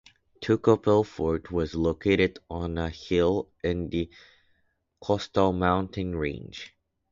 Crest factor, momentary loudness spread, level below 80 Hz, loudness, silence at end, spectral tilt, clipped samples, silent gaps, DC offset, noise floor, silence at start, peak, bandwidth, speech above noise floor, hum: 20 dB; 15 LU; -44 dBFS; -27 LUFS; 0.45 s; -7 dB/octave; under 0.1%; none; under 0.1%; -71 dBFS; 0.4 s; -8 dBFS; 7.4 kHz; 45 dB; none